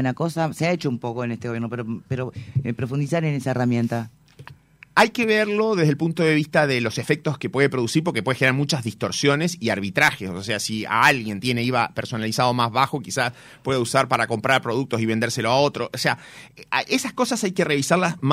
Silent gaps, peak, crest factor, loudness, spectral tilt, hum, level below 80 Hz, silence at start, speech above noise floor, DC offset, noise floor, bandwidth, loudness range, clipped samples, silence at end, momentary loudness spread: none; -2 dBFS; 20 dB; -22 LUFS; -5 dB/octave; none; -60 dBFS; 0 s; 25 dB; under 0.1%; -47 dBFS; 16 kHz; 5 LU; under 0.1%; 0 s; 9 LU